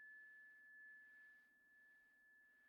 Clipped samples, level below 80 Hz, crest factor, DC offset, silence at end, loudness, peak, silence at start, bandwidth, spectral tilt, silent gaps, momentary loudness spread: under 0.1%; under -90 dBFS; 10 dB; under 0.1%; 0 s; -63 LUFS; -58 dBFS; 0 s; 4.8 kHz; 0.5 dB/octave; none; 8 LU